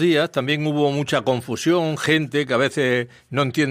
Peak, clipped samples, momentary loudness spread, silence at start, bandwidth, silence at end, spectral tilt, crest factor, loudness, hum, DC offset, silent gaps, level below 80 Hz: -6 dBFS; under 0.1%; 4 LU; 0 s; 15.5 kHz; 0 s; -5.5 dB/octave; 14 dB; -21 LUFS; none; under 0.1%; none; -62 dBFS